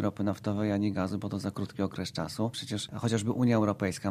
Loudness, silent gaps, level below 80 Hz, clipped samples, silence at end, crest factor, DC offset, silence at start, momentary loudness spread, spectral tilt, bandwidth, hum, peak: -31 LUFS; none; -64 dBFS; under 0.1%; 0 s; 18 dB; under 0.1%; 0 s; 8 LU; -6 dB/octave; 15 kHz; none; -12 dBFS